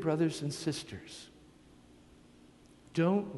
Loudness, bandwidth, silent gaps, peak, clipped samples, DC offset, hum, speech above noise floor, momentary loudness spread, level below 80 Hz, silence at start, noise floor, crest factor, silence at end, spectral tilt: -34 LUFS; 11.5 kHz; none; -16 dBFS; under 0.1%; under 0.1%; 60 Hz at -65 dBFS; 26 dB; 19 LU; -66 dBFS; 0 s; -59 dBFS; 20 dB; 0 s; -6 dB/octave